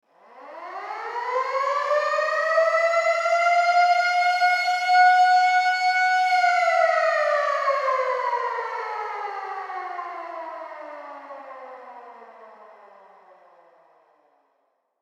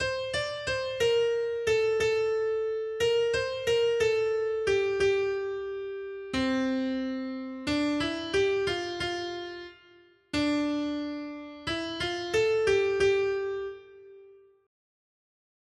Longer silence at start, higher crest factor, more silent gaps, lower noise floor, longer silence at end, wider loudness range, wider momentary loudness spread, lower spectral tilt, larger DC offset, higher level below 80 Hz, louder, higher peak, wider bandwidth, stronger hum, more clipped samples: first, 0.35 s vs 0 s; about the same, 16 dB vs 14 dB; neither; first, -71 dBFS vs -58 dBFS; first, 2.4 s vs 1.3 s; first, 18 LU vs 4 LU; first, 20 LU vs 11 LU; second, 2 dB/octave vs -4 dB/octave; neither; second, under -90 dBFS vs -56 dBFS; first, -21 LUFS vs -28 LUFS; first, -8 dBFS vs -14 dBFS; about the same, 11.5 kHz vs 12.5 kHz; neither; neither